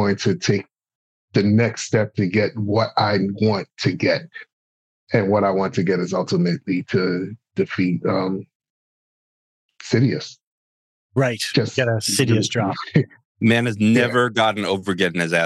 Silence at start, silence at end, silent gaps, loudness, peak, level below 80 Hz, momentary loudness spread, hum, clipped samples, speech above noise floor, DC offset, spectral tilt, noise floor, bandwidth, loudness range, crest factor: 0 s; 0 s; 0.95-1.28 s, 4.53-5.07 s, 8.55-8.60 s, 8.70-9.69 s, 10.43-11.10 s, 13.25-13.35 s; -20 LUFS; -4 dBFS; -70 dBFS; 7 LU; none; under 0.1%; over 70 dB; under 0.1%; -5.5 dB/octave; under -90 dBFS; 12.5 kHz; 6 LU; 16 dB